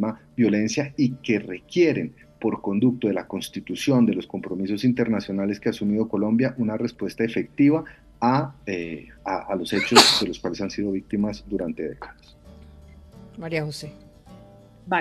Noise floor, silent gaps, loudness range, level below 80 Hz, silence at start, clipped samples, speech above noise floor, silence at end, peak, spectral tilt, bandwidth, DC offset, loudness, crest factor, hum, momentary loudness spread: -48 dBFS; none; 10 LU; -54 dBFS; 0 s; under 0.1%; 25 dB; 0 s; 0 dBFS; -4.5 dB/octave; 13.5 kHz; under 0.1%; -23 LUFS; 24 dB; none; 12 LU